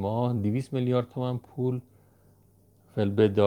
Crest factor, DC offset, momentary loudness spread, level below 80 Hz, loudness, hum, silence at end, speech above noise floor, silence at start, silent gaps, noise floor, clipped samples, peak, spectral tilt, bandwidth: 20 dB; under 0.1%; 8 LU; -68 dBFS; -29 LUFS; none; 0 s; 34 dB; 0 s; none; -61 dBFS; under 0.1%; -8 dBFS; -9 dB/octave; 10.5 kHz